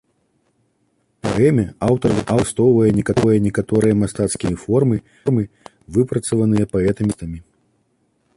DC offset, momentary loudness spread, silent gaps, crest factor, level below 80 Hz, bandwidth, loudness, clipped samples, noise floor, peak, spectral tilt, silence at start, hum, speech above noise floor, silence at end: under 0.1%; 8 LU; none; 16 dB; -42 dBFS; 11.5 kHz; -18 LUFS; under 0.1%; -65 dBFS; -2 dBFS; -7 dB/octave; 1.25 s; none; 48 dB; 0.95 s